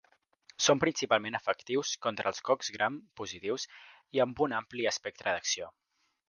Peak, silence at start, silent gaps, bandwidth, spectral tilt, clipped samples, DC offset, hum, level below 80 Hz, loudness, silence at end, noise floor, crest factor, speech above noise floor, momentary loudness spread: -10 dBFS; 0.6 s; none; 10.5 kHz; -2.5 dB/octave; under 0.1%; under 0.1%; none; -70 dBFS; -32 LUFS; 0.6 s; -63 dBFS; 22 dB; 31 dB; 10 LU